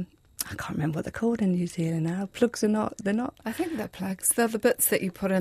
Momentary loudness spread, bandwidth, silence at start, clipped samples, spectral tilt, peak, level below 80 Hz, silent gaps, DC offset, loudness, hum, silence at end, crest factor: 10 LU; 15.5 kHz; 0 s; under 0.1%; -5 dB/octave; -10 dBFS; -58 dBFS; none; under 0.1%; -27 LUFS; none; 0 s; 18 dB